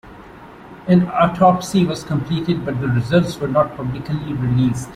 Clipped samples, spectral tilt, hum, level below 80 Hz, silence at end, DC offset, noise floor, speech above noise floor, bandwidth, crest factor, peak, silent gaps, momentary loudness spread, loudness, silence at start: under 0.1%; -7 dB/octave; none; -44 dBFS; 0 s; under 0.1%; -39 dBFS; 22 dB; 13 kHz; 16 dB; -2 dBFS; none; 10 LU; -18 LUFS; 0.05 s